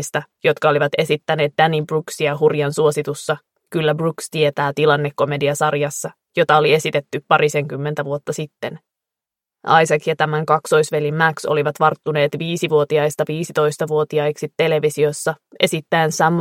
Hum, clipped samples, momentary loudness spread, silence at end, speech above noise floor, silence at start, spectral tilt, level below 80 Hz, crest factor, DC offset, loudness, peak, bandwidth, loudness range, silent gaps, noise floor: none; under 0.1%; 8 LU; 0 s; 69 dB; 0 s; -5 dB/octave; -64 dBFS; 18 dB; under 0.1%; -18 LUFS; 0 dBFS; 16 kHz; 2 LU; none; -87 dBFS